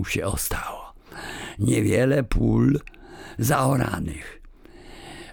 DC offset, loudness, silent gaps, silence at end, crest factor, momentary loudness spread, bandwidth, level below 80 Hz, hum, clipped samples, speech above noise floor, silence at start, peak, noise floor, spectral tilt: under 0.1%; -23 LUFS; none; 0 s; 16 dB; 21 LU; over 20 kHz; -36 dBFS; none; under 0.1%; 23 dB; 0 s; -8 dBFS; -45 dBFS; -6 dB/octave